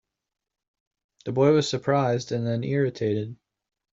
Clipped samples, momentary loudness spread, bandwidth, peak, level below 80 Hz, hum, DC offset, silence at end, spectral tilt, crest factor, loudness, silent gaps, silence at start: under 0.1%; 10 LU; 7.8 kHz; -8 dBFS; -66 dBFS; none; under 0.1%; 0.6 s; -6 dB/octave; 18 dB; -24 LUFS; none; 1.25 s